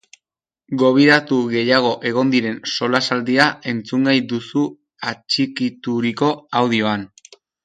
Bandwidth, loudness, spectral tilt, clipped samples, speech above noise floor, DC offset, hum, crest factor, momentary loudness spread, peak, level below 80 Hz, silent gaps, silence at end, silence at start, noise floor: 9.6 kHz; -18 LUFS; -5 dB/octave; under 0.1%; 68 dB; under 0.1%; none; 18 dB; 11 LU; 0 dBFS; -64 dBFS; none; 0.6 s; 0.7 s; -86 dBFS